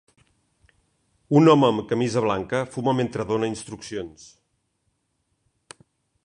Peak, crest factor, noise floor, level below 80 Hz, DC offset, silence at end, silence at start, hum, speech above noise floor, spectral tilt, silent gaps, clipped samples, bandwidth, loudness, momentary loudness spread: -4 dBFS; 22 dB; -73 dBFS; -58 dBFS; under 0.1%; 2.15 s; 1.3 s; none; 51 dB; -6.5 dB/octave; none; under 0.1%; 11 kHz; -22 LUFS; 17 LU